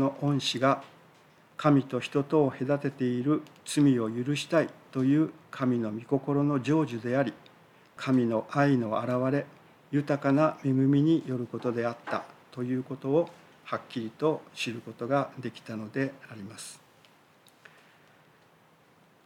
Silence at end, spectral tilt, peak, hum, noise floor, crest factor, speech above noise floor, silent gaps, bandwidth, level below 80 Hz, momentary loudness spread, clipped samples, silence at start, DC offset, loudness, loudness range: 2.5 s; -6.5 dB/octave; -10 dBFS; none; -61 dBFS; 18 dB; 33 dB; none; 12.5 kHz; -80 dBFS; 13 LU; under 0.1%; 0 s; under 0.1%; -29 LUFS; 8 LU